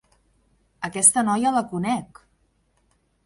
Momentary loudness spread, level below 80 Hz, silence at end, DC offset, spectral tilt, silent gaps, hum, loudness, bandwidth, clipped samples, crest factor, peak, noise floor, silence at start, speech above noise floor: 14 LU; -62 dBFS; 1.2 s; under 0.1%; -3 dB/octave; none; none; -20 LUFS; 11.5 kHz; under 0.1%; 24 dB; -2 dBFS; -66 dBFS; 0.8 s; 45 dB